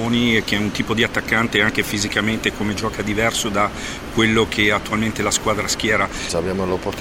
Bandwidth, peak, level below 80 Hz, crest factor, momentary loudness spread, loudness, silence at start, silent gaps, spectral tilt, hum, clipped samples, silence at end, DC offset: 16.5 kHz; -2 dBFS; -38 dBFS; 18 dB; 6 LU; -19 LUFS; 0 s; none; -3.5 dB/octave; none; under 0.1%; 0 s; under 0.1%